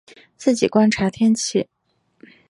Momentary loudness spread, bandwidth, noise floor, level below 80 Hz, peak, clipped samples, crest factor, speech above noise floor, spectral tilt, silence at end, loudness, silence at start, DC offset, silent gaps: 8 LU; 11.5 kHz; -65 dBFS; -54 dBFS; -2 dBFS; under 0.1%; 18 dB; 47 dB; -5 dB/octave; 0.85 s; -19 LUFS; 0.4 s; under 0.1%; none